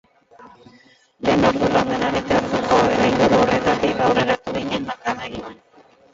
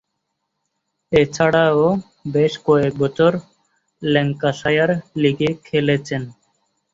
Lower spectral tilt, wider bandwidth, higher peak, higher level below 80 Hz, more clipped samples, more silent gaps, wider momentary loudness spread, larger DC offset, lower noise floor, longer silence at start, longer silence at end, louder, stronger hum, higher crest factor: about the same, -5.5 dB/octave vs -6.5 dB/octave; about the same, 7.8 kHz vs 7.8 kHz; about the same, -2 dBFS vs -2 dBFS; first, -44 dBFS vs -54 dBFS; neither; neither; about the same, 10 LU vs 9 LU; neither; second, -52 dBFS vs -75 dBFS; second, 0.4 s vs 1.1 s; about the same, 0.6 s vs 0.6 s; about the same, -19 LUFS vs -18 LUFS; neither; about the same, 18 dB vs 18 dB